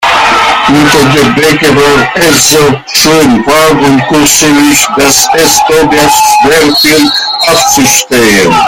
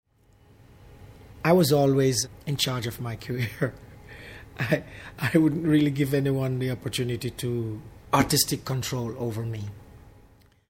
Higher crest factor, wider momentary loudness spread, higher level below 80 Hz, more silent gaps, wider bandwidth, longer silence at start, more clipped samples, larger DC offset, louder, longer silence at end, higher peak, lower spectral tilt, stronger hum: second, 6 dB vs 20 dB; second, 2 LU vs 15 LU; first, -32 dBFS vs -52 dBFS; neither; first, over 20 kHz vs 16.5 kHz; second, 0 s vs 0.85 s; first, 2% vs under 0.1%; neither; first, -4 LUFS vs -26 LUFS; second, 0 s vs 0.6 s; first, 0 dBFS vs -6 dBFS; second, -2.5 dB/octave vs -5 dB/octave; neither